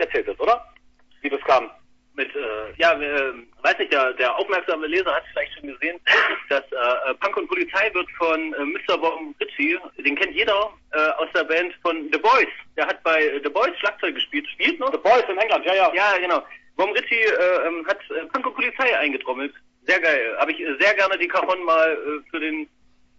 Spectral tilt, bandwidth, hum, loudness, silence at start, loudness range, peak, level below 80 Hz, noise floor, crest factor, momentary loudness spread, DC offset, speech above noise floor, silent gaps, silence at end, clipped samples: -3 dB/octave; 7.8 kHz; none; -21 LUFS; 0 s; 3 LU; -4 dBFS; -60 dBFS; -53 dBFS; 18 dB; 10 LU; under 0.1%; 32 dB; none; 0.55 s; under 0.1%